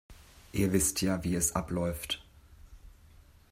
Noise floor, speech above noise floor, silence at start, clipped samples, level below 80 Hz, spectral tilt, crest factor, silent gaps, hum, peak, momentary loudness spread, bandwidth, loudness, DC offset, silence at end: -57 dBFS; 27 dB; 0.1 s; under 0.1%; -50 dBFS; -4 dB/octave; 20 dB; none; none; -14 dBFS; 10 LU; 16 kHz; -31 LUFS; under 0.1%; 0.6 s